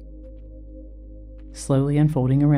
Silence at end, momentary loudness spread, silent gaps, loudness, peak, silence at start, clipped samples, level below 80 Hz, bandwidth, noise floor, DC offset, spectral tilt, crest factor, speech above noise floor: 0 s; 24 LU; none; -20 LUFS; -8 dBFS; 0 s; under 0.1%; -40 dBFS; 11.5 kHz; -39 dBFS; under 0.1%; -8.5 dB/octave; 14 dB; 21 dB